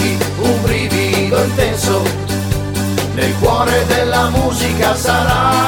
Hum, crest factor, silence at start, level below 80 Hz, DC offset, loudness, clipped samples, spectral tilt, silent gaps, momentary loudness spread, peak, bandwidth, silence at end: none; 12 dB; 0 s; -28 dBFS; 0.1%; -14 LUFS; under 0.1%; -4.5 dB/octave; none; 5 LU; -2 dBFS; 19 kHz; 0 s